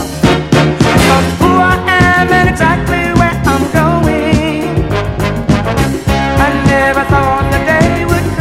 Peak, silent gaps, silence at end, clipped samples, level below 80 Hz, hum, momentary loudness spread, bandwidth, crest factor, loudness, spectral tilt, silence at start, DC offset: 0 dBFS; none; 0 s; 0.3%; -22 dBFS; none; 5 LU; 16 kHz; 10 dB; -10 LUFS; -6 dB/octave; 0 s; under 0.1%